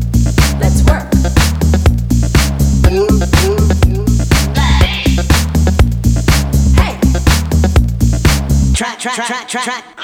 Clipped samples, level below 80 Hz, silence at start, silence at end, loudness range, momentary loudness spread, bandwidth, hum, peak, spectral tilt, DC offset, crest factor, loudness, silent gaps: under 0.1%; -14 dBFS; 0 s; 0 s; 1 LU; 4 LU; 17 kHz; none; 0 dBFS; -5.5 dB/octave; under 0.1%; 10 dB; -12 LUFS; none